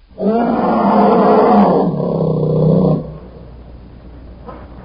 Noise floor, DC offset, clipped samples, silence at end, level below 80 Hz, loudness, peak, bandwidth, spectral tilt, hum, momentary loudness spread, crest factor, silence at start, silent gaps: -35 dBFS; under 0.1%; under 0.1%; 0 s; -38 dBFS; -13 LUFS; 0 dBFS; 5.4 kHz; -8.5 dB/octave; none; 23 LU; 14 dB; 0.2 s; none